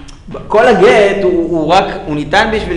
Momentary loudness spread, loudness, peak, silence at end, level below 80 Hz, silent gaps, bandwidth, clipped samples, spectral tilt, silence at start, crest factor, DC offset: 12 LU; -10 LUFS; 0 dBFS; 0 s; -32 dBFS; none; 10.5 kHz; under 0.1%; -5.5 dB/octave; 0 s; 10 dB; under 0.1%